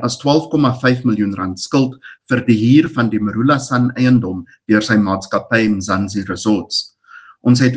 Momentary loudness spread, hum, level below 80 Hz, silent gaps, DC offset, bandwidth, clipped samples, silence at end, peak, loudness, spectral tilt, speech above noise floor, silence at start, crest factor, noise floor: 8 LU; none; -54 dBFS; none; under 0.1%; 9.4 kHz; under 0.1%; 0 s; 0 dBFS; -16 LUFS; -6 dB/octave; 27 dB; 0 s; 16 dB; -42 dBFS